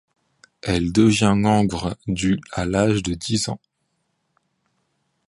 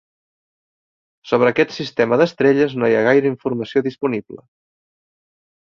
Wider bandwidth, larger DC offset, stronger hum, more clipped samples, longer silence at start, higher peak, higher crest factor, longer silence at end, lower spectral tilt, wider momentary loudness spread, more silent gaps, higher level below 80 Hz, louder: first, 11.5 kHz vs 7 kHz; neither; neither; neither; second, 0.65 s vs 1.25 s; about the same, -2 dBFS vs -2 dBFS; about the same, 20 dB vs 18 dB; first, 1.75 s vs 1.4 s; second, -5.5 dB/octave vs -7 dB/octave; about the same, 10 LU vs 8 LU; neither; first, -42 dBFS vs -62 dBFS; about the same, -20 LUFS vs -18 LUFS